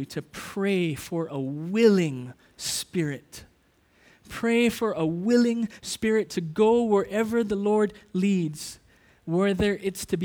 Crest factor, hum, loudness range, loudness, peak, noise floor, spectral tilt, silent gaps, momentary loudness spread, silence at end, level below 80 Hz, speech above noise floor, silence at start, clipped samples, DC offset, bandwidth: 18 dB; none; 3 LU; -25 LUFS; -8 dBFS; -63 dBFS; -5.5 dB/octave; none; 14 LU; 0 s; -54 dBFS; 38 dB; 0 s; under 0.1%; under 0.1%; 20 kHz